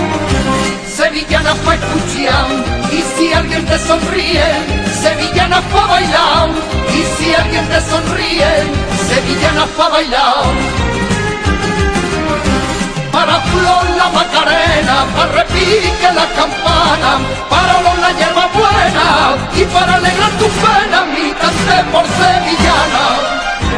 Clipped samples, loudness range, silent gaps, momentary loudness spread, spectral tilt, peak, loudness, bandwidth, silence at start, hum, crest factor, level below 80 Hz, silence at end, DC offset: under 0.1%; 3 LU; none; 5 LU; -4 dB/octave; 0 dBFS; -11 LUFS; 11 kHz; 0 s; none; 12 dB; -24 dBFS; 0 s; under 0.1%